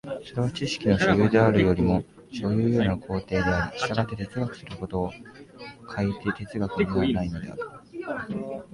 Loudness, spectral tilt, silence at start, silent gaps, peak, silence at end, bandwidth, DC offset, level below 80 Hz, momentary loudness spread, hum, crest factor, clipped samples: -26 LUFS; -7 dB/octave; 0.05 s; none; -6 dBFS; 0.1 s; 11.5 kHz; under 0.1%; -44 dBFS; 17 LU; none; 18 dB; under 0.1%